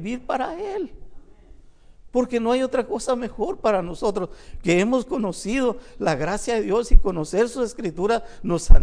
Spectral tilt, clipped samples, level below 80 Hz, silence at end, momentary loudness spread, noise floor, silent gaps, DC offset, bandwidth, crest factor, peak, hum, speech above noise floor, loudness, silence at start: -5.5 dB/octave; under 0.1%; -24 dBFS; 0 s; 7 LU; -47 dBFS; none; under 0.1%; 10.5 kHz; 20 dB; 0 dBFS; none; 28 dB; -24 LUFS; 0 s